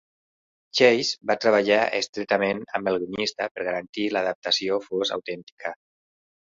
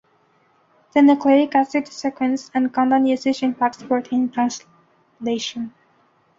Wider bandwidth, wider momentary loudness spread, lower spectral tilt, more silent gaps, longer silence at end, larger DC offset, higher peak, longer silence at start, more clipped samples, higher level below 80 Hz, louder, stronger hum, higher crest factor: about the same, 7.8 kHz vs 7.6 kHz; about the same, 12 LU vs 12 LU; about the same, -3.5 dB/octave vs -4 dB/octave; first, 2.09-2.13 s, 3.51-3.55 s, 3.89-3.93 s, 4.35-4.42 s, 5.43-5.57 s vs none; about the same, 0.75 s vs 0.7 s; neither; about the same, -4 dBFS vs -4 dBFS; second, 0.75 s vs 0.95 s; neither; about the same, -66 dBFS vs -66 dBFS; second, -24 LUFS vs -20 LUFS; neither; about the same, 20 dB vs 16 dB